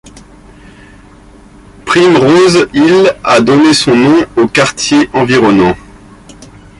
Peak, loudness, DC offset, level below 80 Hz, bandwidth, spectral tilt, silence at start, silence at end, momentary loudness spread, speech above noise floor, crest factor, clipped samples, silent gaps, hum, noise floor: 0 dBFS; -8 LUFS; under 0.1%; -40 dBFS; 11.5 kHz; -5 dB/octave; 0.05 s; 0.35 s; 4 LU; 30 dB; 10 dB; under 0.1%; none; none; -37 dBFS